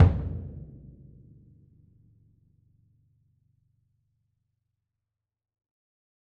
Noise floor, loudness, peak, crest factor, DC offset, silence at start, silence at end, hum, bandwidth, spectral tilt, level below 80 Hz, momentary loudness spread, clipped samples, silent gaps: -87 dBFS; -29 LUFS; -6 dBFS; 26 dB; under 0.1%; 0 s; 5.6 s; none; 3.9 kHz; -10 dB/octave; -42 dBFS; 26 LU; under 0.1%; none